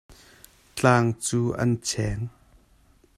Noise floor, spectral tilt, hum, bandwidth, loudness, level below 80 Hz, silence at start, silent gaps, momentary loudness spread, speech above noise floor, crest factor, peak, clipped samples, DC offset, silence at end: -59 dBFS; -5 dB/octave; none; 14.5 kHz; -24 LUFS; -48 dBFS; 0.1 s; none; 15 LU; 36 dB; 20 dB; -6 dBFS; under 0.1%; under 0.1%; 0.9 s